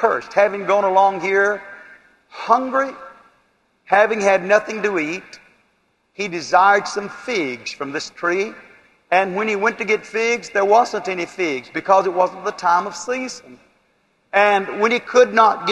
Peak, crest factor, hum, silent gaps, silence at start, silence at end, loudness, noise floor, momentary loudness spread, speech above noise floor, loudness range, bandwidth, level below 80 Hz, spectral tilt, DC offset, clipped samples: 0 dBFS; 18 dB; none; none; 0 s; 0 s; -18 LUFS; -64 dBFS; 12 LU; 46 dB; 3 LU; 11.5 kHz; -66 dBFS; -3.5 dB/octave; under 0.1%; under 0.1%